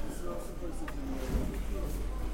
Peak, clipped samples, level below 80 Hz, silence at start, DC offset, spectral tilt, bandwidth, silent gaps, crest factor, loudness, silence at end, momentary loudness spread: -20 dBFS; under 0.1%; -36 dBFS; 0 s; under 0.1%; -6 dB/octave; 16.5 kHz; none; 14 dB; -39 LUFS; 0 s; 5 LU